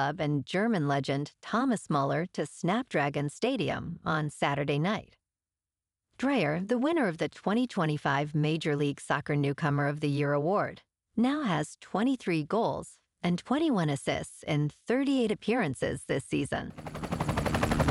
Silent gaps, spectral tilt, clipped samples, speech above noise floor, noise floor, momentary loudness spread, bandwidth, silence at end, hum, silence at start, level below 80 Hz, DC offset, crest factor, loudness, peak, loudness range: none; -6 dB/octave; under 0.1%; over 61 dB; under -90 dBFS; 6 LU; 13 kHz; 0 s; none; 0 s; -52 dBFS; under 0.1%; 16 dB; -30 LUFS; -12 dBFS; 2 LU